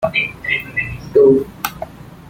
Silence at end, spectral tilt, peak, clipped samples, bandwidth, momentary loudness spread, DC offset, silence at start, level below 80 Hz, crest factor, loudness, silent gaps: 0.15 s; -5 dB/octave; 0 dBFS; under 0.1%; 16.5 kHz; 15 LU; under 0.1%; 0 s; -44 dBFS; 18 dB; -16 LUFS; none